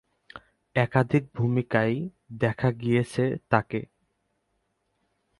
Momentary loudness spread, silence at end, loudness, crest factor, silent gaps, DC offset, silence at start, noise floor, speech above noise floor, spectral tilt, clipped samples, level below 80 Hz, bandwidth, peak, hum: 8 LU; 1.55 s; -26 LUFS; 24 dB; none; under 0.1%; 0.35 s; -75 dBFS; 50 dB; -8 dB/octave; under 0.1%; -58 dBFS; 11.5 kHz; -4 dBFS; none